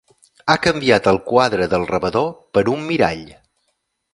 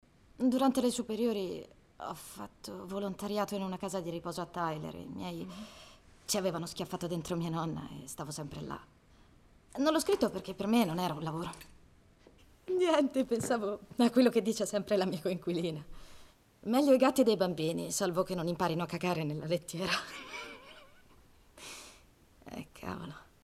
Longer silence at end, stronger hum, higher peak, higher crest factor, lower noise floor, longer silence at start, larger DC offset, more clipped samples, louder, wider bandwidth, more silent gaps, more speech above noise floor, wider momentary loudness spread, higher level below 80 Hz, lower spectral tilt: first, 0.85 s vs 0.2 s; neither; first, 0 dBFS vs -14 dBFS; about the same, 18 dB vs 20 dB; first, -70 dBFS vs -61 dBFS; about the same, 0.45 s vs 0.4 s; neither; neither; first, -17 LUFS vs -33 LUFS; second, 11.5 kHz vs 15.5 kHz; neither; first, 53 dB vs 29 dB; second, 5 LU vs 18 LU; first, -46 dBFS vs -62 dBFS; about the same, -5.5 dB/octave vs -5 dB/octave